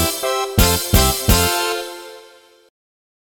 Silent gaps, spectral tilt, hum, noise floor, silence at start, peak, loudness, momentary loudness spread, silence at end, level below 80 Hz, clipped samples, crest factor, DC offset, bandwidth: none; -3.5 dB/octave; none; -47 dBFS; 0 s; 0 dBFS; -16 LUFS; 16 LU; 1.05 s; -26 dBFS; under 0.1%; 18 dB; under 0.1%; over 20 kHz